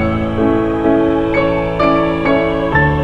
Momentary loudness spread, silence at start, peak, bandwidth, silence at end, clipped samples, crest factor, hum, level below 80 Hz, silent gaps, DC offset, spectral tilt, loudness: 2 LU; 0 s; 0 dBFS; 7.4 kHz; 0 s; under 0.1%; 14 dB; none; -28 dBFS; none; under 0.1%; -8.5 dB/octave; -14 LUFS